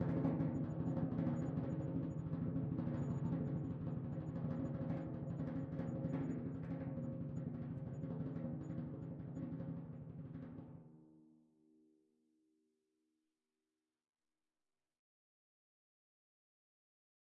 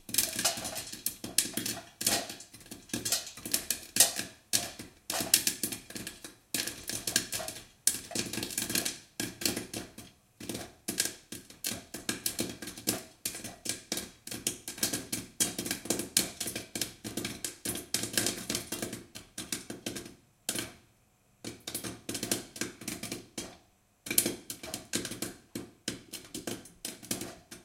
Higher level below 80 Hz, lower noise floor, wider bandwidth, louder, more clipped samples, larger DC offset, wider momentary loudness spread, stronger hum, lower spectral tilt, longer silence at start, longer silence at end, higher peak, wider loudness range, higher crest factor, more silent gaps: about the same, -66 dBFS vs -62 dBFS; first, under -90 dBFS vs -67 dBFS; second, 7 kHz vs 17 kHz; second, -44 LUFS vs -33 LUFS; neither; neither; second, 10 LU vs 14 LU; neither; first, -11 dB/octave vs -1 dB/octave; about the same, 0 s vs 0.1 s; first, 6.1 s vs 0 s; second, -26 dBFS vs -2 dBFS; first, 12 LU vs 8 LU; second, 20 dB vs 34 dB; neither